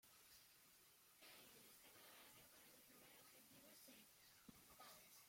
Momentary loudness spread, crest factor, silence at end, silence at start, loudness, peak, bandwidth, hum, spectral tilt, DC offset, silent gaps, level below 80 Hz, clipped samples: 4 LU; 18 dB; 0 s; 0 s; -66 LUFS; -50 dBFS; 16.5 kHz; none; -1.5 dB/octave; under 0.1%; none; under -90 dBFS; under 0.1%